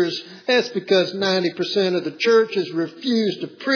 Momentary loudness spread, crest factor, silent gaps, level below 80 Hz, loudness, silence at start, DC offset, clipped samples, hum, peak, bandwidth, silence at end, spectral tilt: 7 LU; 16 dB; none; -84 dBFS; -20 LUFS; 0 s; under 0.1%; under 0.1%; none; -6 dBFS; 5.4 kHz; 0 s; -5 dB/octave